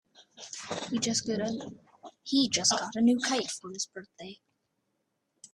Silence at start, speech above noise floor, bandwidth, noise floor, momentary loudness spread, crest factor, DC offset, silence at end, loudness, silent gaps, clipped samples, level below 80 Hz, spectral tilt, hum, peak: 0.2 s; 50 dB; 12.5 kHz; -79 dBFS; 21 LU; 22 dB; under 0.1%; 0.1 s; -29 LUFS; none; under 0.1%; -70 dBFS; -2.5 dB/octave; none; -10 dBFS